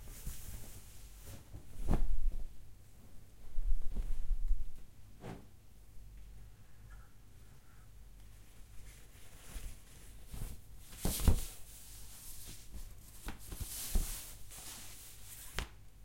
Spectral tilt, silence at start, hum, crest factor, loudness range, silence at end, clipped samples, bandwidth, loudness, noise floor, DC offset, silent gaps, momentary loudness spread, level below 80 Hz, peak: -4 dB/octave; 0 s; none; 24 dB; 15 LU; 0.05 s; under 0.1%; 16.5 kHz; -44 LUFS; -58 dBFS; 0.1%; none; 21 LU; -40 dBFS; -12 dBFS